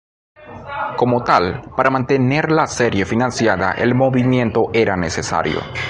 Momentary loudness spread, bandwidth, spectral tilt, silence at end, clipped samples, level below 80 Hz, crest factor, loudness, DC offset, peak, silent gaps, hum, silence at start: 6 LU; 10.5 kHz; -6 dB/octave; 0 s; under 0.1%; -42 dBFS; 18 dB; -17 LUFS; under 0.1%; 0 dBFS; none; none; 0.4 s